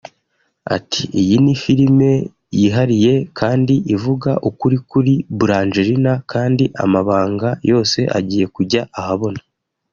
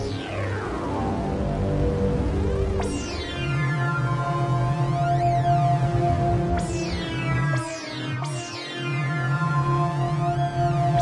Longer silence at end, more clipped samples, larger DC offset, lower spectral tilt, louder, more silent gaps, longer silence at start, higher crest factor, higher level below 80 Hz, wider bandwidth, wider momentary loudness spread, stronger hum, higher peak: first, 0.55 s vs 0 s; neither; neither; about the same, -6.5 dB/octave vs -6.5 dB/octave; first, -16 LUFS vs -25 LUFS; neither; first, 0.65 s vs 0 s; about the same, 14 dB vs 14 dB; second, -50 dBFS vs -36 dBFS; second, 7.4 kHz vs 11 kHz; about the same, 7 LU vs 7 LU; neither; first, -2 dBFS vs -10 dBFS